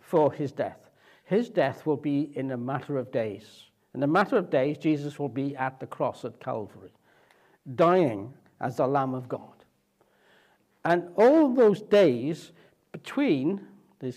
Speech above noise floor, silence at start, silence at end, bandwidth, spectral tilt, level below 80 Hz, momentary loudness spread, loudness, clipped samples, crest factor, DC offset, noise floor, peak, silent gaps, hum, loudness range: 42 dB; 0.1 s; 0.05 s; 14 kHz; -7.5 dB/octave; -78 dBFS; 17 LU; -26 LUFS; under 0.1%; 18 dB; under 0.1%; -67 dBFS; -10 dBFS; none; none; 6 LU